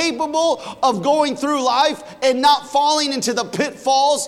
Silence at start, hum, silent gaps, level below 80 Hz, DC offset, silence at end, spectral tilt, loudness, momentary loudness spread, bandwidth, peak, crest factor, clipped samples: 0 s; none; none; -62 dBFS; under 0.1%; 0 s; -2.5 dB/octave; -18 LUFS; 5 LU; 15.5 kHz; -4 dBFS; 14 dB; under 0.1%